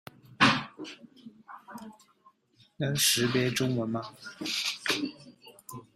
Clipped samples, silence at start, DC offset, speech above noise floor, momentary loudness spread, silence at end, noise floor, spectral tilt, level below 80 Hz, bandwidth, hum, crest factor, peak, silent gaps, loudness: under 0.1%; 0.3 s; under 0.1%; 35 dB; 24 LU; 0.15 s; -65 dBFS; -3 dB/octave; -68 dBFS; 16 kHz; none; 24 dB; -8 dBFS; none; -28 LUFS